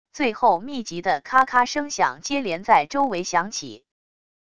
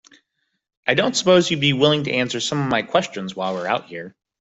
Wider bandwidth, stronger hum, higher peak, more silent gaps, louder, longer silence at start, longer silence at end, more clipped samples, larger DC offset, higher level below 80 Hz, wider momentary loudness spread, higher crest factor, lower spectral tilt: first, 11 kHz vs 8.2 kHz; neither; about the same, -2 dBFS vs -2 dBFS; neither; about the same, -22 LUFS vs -20 LUFS; second, 0.15 s vs 0.85 s; first, 0.75 s vs 0.3 s; neither; first, 0.5% vs under 0.1%; about the same, -60 dBFS vs -58 dBFS; about the same, 10 LU vs 12 LU; about the same, 20 dB vs 18 dB; about the same, -3 dB/octave vs -4 dB/octave